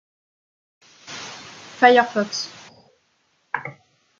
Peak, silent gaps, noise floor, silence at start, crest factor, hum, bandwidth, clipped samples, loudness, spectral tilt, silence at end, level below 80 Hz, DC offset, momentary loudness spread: -2 dBFS; none; -66 dBFS; 1.1 s; 22 dB; none; 7.6 kHz; under 0.1%; -20 LUFS; -3 dB/octave; 0.5 s; -76 dBFS; under 0.1%; 23 LU